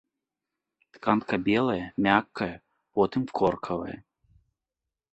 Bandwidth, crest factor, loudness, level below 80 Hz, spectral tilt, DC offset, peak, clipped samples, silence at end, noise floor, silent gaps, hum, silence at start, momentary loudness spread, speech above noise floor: 8.4 kHz; 24 dB; -27 LUFS; -58 dBFS; -7.5 dB/octave; under 0.1%; -6 dBFS; under 0.1%; 1.1 s; -88 dBFS; none; none; 0.95 s; 10 LU; 62 dB